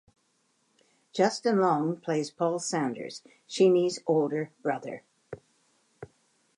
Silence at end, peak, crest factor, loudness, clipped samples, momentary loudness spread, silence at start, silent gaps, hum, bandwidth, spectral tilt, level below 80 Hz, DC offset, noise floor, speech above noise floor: 0.55 s; -10 dBFS; 18 dB; -28 LUFS; under 0.1%; 21 LU; 1.15 s; none; none; 11 kHz; -5 dB/octave; -76 dBFS; under 0.1%; -72 dBFS; 45 dB